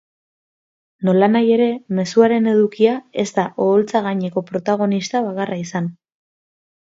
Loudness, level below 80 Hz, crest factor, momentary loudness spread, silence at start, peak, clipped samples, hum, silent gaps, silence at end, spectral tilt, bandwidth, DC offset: -18 LUFS; -66 dBFS; 18 dB; 9 LU; 1 s; -2 dBFS; under 0.1%; none; none; 0.9 s; -6.5 dB/octave; 7.8 kHz; under 0.1%